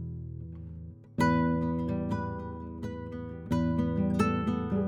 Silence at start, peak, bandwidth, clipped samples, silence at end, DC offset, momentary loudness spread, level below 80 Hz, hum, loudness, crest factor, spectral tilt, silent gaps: 0 s; -12 dBFS; 12 kHz; under 0.1%; 0 s; under 0.1%; 15 LU; -50 dBFS; none; -31 LUFS; 18 dB; -8 dB/octave; none